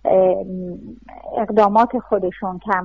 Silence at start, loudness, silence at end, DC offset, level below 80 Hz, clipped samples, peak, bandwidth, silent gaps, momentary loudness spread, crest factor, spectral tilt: 0.05 s; -19 LUFS; 0 s; 0.2%; -50 dBFS; under 0.1%; -4 dBFS; 7.4 kHz; none; 19 LU; 16 dB; -8.5 dB/octave